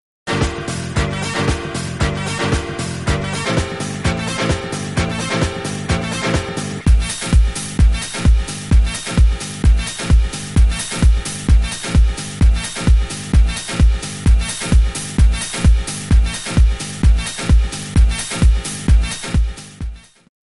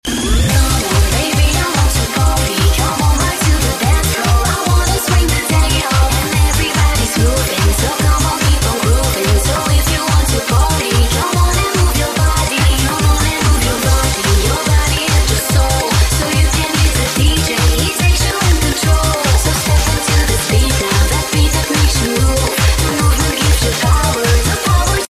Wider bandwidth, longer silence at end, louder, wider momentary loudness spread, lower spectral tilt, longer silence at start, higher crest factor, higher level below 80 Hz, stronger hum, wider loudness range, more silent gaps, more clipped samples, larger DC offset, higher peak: second, 11.5 kHz vs 15.5 kHz; first, 0.45 s vs 0.05 s; second, -18 LUFS vs -13 LUFS; first, 4 LU vs 1 LU; about the same, -5 dB/octave vs -4 dB/octave; first, 0.25 s vs 0.05 s; about the same, 14 dB vs 12 dB; about the same, -16 dBFS vs -16 dBFS; neither; first, 3 LU vs 0 LU; neither; neither; neither; about the same, -2 dBFS vs 0 dBFS